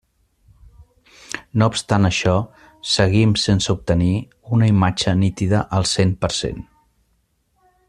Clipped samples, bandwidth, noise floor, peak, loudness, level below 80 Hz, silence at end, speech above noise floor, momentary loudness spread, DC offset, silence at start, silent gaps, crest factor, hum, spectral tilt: under 0.1%; 11 kHz; -65 dBFS; -2 dBFS; -18 LUFS; -42 dBFS; 1.25 s; 48 dB; 11 LU; under 0.1%; 1.3 s; none; 18 dB; none; -5.5 dB/octave